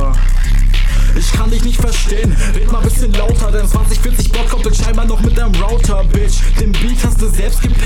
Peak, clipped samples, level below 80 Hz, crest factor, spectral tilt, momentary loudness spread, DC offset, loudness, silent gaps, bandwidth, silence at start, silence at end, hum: -4 dBFS; under 0.1%; -10 dBFS; 6 dB; -5 dB/octave; 1 LU; 2%; -15 LUFS; none; 13.5 kHz; 0 s; 0 s; none